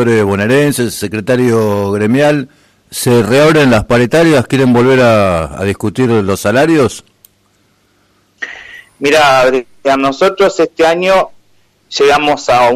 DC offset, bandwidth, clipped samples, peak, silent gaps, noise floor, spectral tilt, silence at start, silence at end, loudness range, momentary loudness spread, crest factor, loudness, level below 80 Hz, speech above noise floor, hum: under 0.1%; 14.5 kHz; under 0.1%; 0 dBFS; none; -54 dBFS; -5.5 dB/octave; 0 s; 0 s; 5 LU; 10 LU; 10 dB; -10 LUFS; -42 dBFS; 45 dB; none